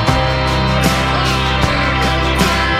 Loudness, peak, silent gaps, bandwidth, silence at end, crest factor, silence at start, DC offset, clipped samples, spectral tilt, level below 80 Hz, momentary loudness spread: -14 LUFS; 0 dBFS; none; 16 kHz; 0 s; 14 dB; 0 s; under 0.1%; under 0.1%; -4.5 dB/octave; -22 dBFS; 1 LU